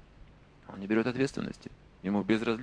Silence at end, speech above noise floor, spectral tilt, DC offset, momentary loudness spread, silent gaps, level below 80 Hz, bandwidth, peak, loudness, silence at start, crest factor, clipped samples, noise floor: 0 s; 24 dB; -6.5 dB/octave; under 0.1%; 19 LU; none; -58 dBFS; 10 kHz; -14 dBFS; -31 LUFS; 0.2 s; 20 dB; under 0.1%; -55 dBFS